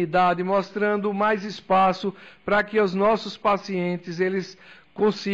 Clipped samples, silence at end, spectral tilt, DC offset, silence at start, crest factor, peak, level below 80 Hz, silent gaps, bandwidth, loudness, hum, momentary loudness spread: under 0.1%; 0 s; -6.5 dB/octave; under 0.1%; 0 s; 12 dB; -12 dBFS; -58 dBFS; none; 7.8 kHz; -23 LUFS; none; 9 LU